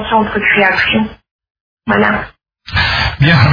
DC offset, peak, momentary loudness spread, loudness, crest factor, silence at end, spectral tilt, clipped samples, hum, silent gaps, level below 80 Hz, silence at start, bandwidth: under 0.1%; 0 dBFS; 11 LU; -12 LUFS; 14 dB; 0 s; -7 dB/octave; under 0.1%; none; 1.31-1.39 s, 1.50-1.77 s; -32 dBFS; 0 s; 5.4 kHz